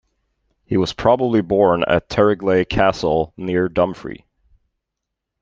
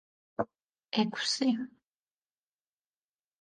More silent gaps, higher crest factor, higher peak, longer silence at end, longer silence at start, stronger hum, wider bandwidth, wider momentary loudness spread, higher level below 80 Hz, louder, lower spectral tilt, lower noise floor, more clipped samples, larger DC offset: second, none vs 0.63-0.69 s; about the same, 18 dB vs 20 dB; first, -2 dBFS vs -16 dBFS; second, 1.25 s vs 1.75 s; first, 0.7 s vs 0.4 s; neither; second, 7.6 kHz vs 9.8 kHz; second, 6 LU vs 13 LU; first, -44 dBFS vs -76 dBFS; first, -18 LUFS vs -32 LUFS; first, -6.5 dB/octave vs -3.5 dB/octave; second, -81 dBFS vs under -90 dBFS; neither; neither